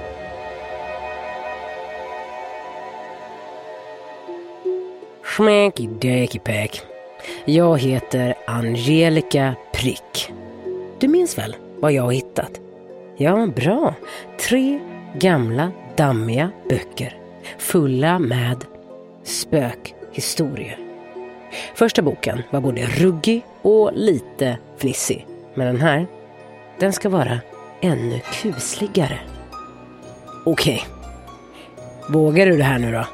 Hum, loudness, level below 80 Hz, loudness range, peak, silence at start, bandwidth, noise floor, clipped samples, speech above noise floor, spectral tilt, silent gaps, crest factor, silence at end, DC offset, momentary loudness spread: none; -20 LUFS; -48 dBFS; 7 LU; 0 dBFS; 0 s; 16.5 kHz; -41 dBFS; under 0.1%; 23 dB; -5.5 dB/octave; none; 20 dB; 0 s; under 0.1%; 20 LU